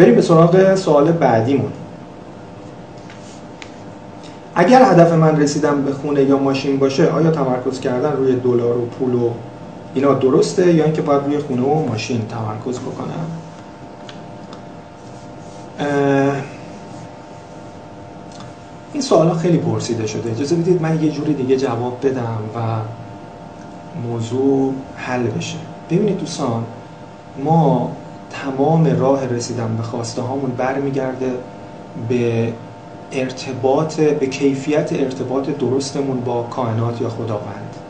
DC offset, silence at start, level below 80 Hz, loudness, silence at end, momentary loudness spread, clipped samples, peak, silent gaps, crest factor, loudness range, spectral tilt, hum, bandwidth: 0.3%; 0 s; -54 dBFS; -17 LUFS; 0 s; 21 LU; under 0.1%; 0 dBFS; none; 18 dB; 8 LU; -7 dB/octave; none; 9.2 kHz